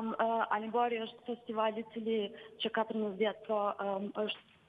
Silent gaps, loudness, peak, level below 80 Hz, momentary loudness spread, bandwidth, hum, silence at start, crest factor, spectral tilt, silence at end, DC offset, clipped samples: none; -35 LUFS; -18 dBFS; -82 dBFS; 7 LU; 4.9 kHz; none; 0 s; 18 dB; -7 dB/octave; 0.3 s; under 0.1%; under 0.1%